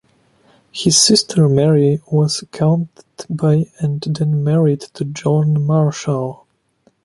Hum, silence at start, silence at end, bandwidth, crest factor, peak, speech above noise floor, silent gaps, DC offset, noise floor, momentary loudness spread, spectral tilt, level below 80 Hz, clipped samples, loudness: none; 0.75 s; 0.7 s; 11.5 kHz; 16 dB; 0 dBFS; 43 dB; none; under 0.1%; -59 dBFS; 11 LU; -5.5 dB/octave; -54 dBFS; under 0.1%; -16 LUFS